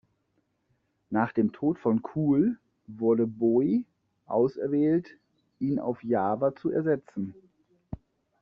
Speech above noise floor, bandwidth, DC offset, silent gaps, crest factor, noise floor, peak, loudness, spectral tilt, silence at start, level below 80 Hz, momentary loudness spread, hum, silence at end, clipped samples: 48 dB; 5.4 kHz; under 0.1%; none; 18 dB; -74 dBFS; -10 dBFS; -27 LUFS; -9.5 dB/octave; 1.1 s; -62 dBFS; 13 LU; none; 0.45 s; under 0.1%